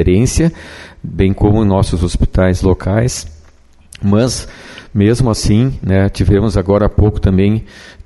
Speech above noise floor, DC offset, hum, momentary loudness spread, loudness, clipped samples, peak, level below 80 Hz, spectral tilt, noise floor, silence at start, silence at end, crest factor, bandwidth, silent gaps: 31 dB; under 0.1%; none; 12 LU; -14 LUFS; under 0.1%; 0 dBFS; -24 dBFS; -6.5 dB/octave; -43 dBFS; 0 s; 0.15 s; 12 dB; 12 kHz; none